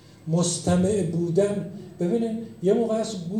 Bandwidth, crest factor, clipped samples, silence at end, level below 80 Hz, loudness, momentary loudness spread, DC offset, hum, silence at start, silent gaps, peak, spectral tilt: 12 kHz; 16 dB; under 0.1%; 0 s; -56 dBFS; -24 LUFS; 8 LU; under 0.1%; none; 0.25 s; none; -8 dBFS; -6 dB/octave